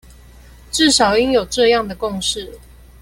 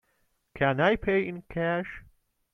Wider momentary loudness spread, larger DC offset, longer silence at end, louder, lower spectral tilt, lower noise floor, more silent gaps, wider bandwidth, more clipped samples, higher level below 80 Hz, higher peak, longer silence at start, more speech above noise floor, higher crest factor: about the same, 12 LU vs 13 LU; neither; about the same, 0.45 s vs 0.5 s; first, -16 LUFS vs -27 LUFS; second, -2.5 dB/octave vs -8 dB/octave; second, -42 dBFS vs -72 dBFS; neither; first, 16.5 kHz vs 6.2 kHz; neither; first, -40 dBFS vs -52 dBFS; first, -2 dBFS vs -10 dBFS; first, 0.75 s vs 0.55 s; second, 26 dB vs 45 dB; about the same, 16 dB vs 18 dB